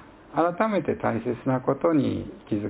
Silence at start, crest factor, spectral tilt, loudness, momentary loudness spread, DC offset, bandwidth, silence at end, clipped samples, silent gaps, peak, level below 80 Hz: 0 s; 18 dB; -11.5 dB/octave; -26 LUFS; 8 LU; under 0.1%; 4 kHz; 0 s; under 0.1%; none; -8 dBFS; -54 dBFS